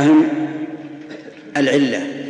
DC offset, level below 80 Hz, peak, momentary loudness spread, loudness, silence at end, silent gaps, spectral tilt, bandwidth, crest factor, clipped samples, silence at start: under 0.1%; -70 dBFS; -2 dBFS; 20 LU; -18 LUFS; 0 s; none; -5.5 dB/octave; 9.8 kHz; 16 dB; under 0.1%; 0 s